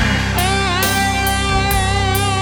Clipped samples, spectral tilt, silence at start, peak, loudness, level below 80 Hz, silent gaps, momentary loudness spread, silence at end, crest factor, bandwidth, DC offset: under 0.1%; -3.5 dB/octave; 0 s; -2 dBFS; -16 LUFS; -24 dBFS; none; 1 LU; 0 s; 14 dB; over 20 kHz; under 0.1%